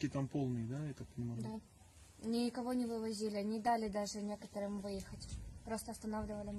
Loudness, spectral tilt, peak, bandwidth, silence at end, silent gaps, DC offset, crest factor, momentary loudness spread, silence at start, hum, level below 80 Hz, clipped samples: -41 LUFS; -6 dB/octave; -24 dBFS; 12.5 kHz; 0 s; none; under 0.1%; 16 dB; 11 LU; 0 s; none; -60 dBFS; under 0.1%